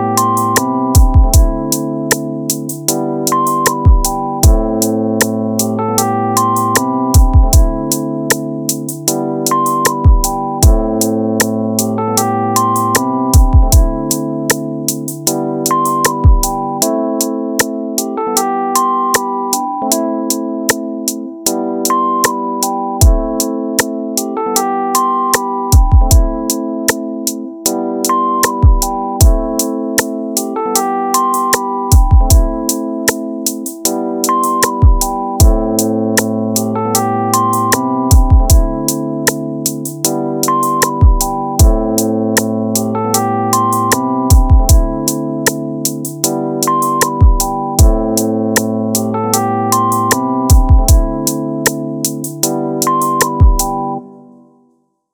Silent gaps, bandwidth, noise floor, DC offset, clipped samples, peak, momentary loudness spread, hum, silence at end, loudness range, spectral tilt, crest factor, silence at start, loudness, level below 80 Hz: none; over 20 kHz; -57 dBFS; under 0.1%; under 0.1%; 0 dBFS; 7 LU; none; 0.95 s; 2 LU; -4.5 dB/octave; 12 dB; 0 s; -13 LUFS; -16 dBFS